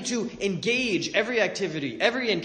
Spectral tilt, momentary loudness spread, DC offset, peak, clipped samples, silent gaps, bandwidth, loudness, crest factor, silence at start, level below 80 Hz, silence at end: -3.5 dB/octave; 6 LU; under 0.1%; -6 dBFS; under 0.1%; none; 9.8 kHz; -25 LUFS; 20 dB; 0 s; -62 dBFS; 0 s